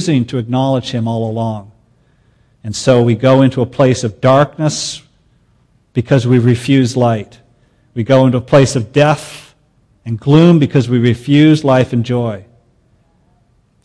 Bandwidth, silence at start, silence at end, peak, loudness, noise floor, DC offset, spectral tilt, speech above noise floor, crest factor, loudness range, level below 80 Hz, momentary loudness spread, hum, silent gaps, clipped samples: 11 kHz; 0 s; 1.45 s; 0 dBFS; -12 LUFS; -54 dBFS; under 0.1%; -6.5 dB/octave; 43 dB; 14 dB; 3 LU; -48 dBFS; 13 LU; none; none; under 0.1%